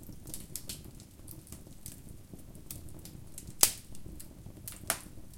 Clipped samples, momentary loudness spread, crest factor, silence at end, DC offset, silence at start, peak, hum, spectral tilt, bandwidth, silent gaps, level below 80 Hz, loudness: under 0.1%; 24 LU; 40 dB; 0 s; under 0.1%; 0 s; 0 dBFS; none; -1.5 dB/octave; 17 kHz; none; -54 dBFS; -34 LUFS